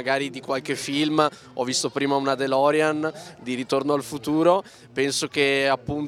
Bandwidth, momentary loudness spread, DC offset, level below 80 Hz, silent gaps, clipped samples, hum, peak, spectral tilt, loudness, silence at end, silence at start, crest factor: 16 kHz; 9 LU; under 0.1%; -60 dBFS; none; under 0.1%; none; -4 dBFS; -4 dB/octave; -23 LUFS; 0 s; 0 s; 20 dB